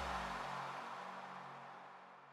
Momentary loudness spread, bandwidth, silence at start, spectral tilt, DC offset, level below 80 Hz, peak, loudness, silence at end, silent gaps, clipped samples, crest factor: 13 LU; 15.5 kHz; 0 s; -4 dB/octave; under 0.1%; -64 dBFS; -30 dBFS; -47 LUFS; 0 s; none; under 0.1%; 18 dB